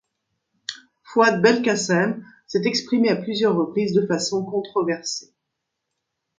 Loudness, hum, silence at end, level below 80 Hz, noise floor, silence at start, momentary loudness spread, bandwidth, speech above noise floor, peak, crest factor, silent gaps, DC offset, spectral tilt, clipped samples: -21 LUFS; none; 1.15 s; -68 dBFS; -80 dBFS; 0.7 s; 15 LU; 9.4 kHz; 59 dB; -4 dBFS; 20 dB; none; under 0.1%; -4.5 dB/octave; under 0.1%